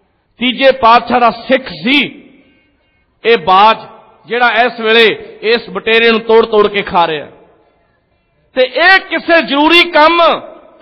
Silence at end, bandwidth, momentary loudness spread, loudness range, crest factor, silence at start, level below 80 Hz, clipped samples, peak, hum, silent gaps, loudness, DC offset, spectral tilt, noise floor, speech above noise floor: 0.3 s; 10 kHz; 9 LU; 3 LU; 12 dB; 0.4 s; -48 dBFS; 0.1%; 0 dBFS; none; none; -10 LUFS; under 0.1%; -5 dB/octave; -57 dBFS; 47 dB